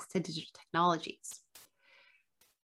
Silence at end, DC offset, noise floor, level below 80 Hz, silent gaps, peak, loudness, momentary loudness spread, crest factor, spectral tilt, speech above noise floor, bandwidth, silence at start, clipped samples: 1.05 s; under 0.1%; -71 dBFS; -82 dBFS; none; -16 dBFS; -35 LUFS; 17 LU; 22 dB; -4.5 dB/octave; 36 dB; 16 kHz; 0 s; under 0.1%